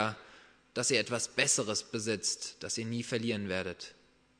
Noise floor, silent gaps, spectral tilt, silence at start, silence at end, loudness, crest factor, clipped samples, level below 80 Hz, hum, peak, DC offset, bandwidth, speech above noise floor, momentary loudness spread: -59 dBFS; none; -2.5 dB/octave; 0 s; 0.45 s; -32 LUFS; 24 dB; under 0.1%; -72 dBFS; none; -10 dBFS; under 0.1%; 11 kHz; 25 dB; 13 LU